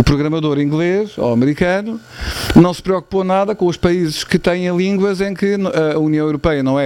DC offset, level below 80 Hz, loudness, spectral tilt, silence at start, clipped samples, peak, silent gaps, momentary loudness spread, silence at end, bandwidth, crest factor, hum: under 0.1%; -34 dBFS; -16 LUFS; -6.5 dB/octave; 0 s; under 0.1%; 0 dBFS; none; 5 LU; 0 s; 17 kHz; 14 dB; none